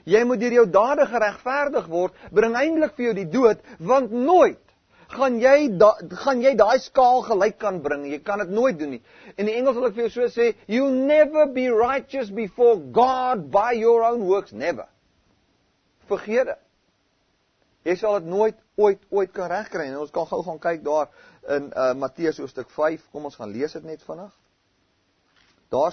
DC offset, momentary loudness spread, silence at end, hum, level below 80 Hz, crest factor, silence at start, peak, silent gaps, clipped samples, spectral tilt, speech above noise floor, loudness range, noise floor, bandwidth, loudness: under 0.1%; 13 LU; 0 s; none; -60 dBFS; 20 dB; 0.05 s; -2 dBFS; none; under 0.1%; -5.5 dB/octave; 46 dB; 9 LU; -67 dBFS; 6.6 kHz; -21 LUFS